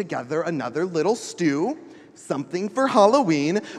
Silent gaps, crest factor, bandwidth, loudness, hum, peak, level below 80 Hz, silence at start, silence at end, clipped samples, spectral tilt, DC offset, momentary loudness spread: none; 20 dB; 12 kHz; -22 LUFS; none; -4 dBFS; -76 dBFS; 0 s; 0 s; under 0.1%; -5.5 dB/octave; under 0.1%; 11 LU